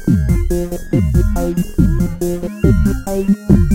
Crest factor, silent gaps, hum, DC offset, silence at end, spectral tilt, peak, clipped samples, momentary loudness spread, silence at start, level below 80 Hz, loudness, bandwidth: 14 dB; none; none; under 0.1%; 0 s; -8 dB/octave; 0 dBFS; under 0.1%; 6 LU; 0 s; -20 dBFS; -16 LUFS; 16.5 kHz